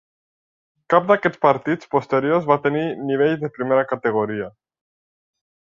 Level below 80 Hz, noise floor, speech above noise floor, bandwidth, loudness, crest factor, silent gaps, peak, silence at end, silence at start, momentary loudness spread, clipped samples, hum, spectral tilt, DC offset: -64 dBFS; under -90 dBFS; over 71 dB; 7.2 kHz; -20 LUFS; 20 dB; none; -2 dBFS; 1.25 s; 0.9 s; 7 LU; under 0.1%; none; -8 dB/octave; under 0.1%